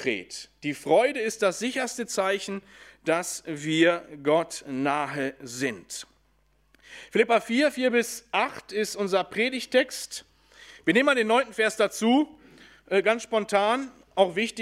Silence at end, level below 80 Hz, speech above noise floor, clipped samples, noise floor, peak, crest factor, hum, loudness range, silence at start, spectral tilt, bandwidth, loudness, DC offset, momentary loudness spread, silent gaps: 0 s; -68 dBFS; 40 dB; under 0.1%; -66 dBFS; -6 dBFS; 20 dB; none; 3 LU; 0 s; -3.5 dB/octave; 16 kHz; -26 LUFS; under 0.1%; 11 LU; none